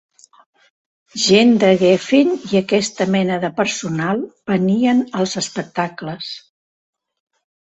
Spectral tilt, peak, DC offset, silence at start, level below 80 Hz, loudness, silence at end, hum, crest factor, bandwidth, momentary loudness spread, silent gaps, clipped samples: -5 dB/octave; 0 dBFS; under 0.1%; 1.15 s; -60 dBFS; -17 LUFS; 1.35 s; none; 18 dB; 8.2 kHz; 13 LU; none; under 0.1%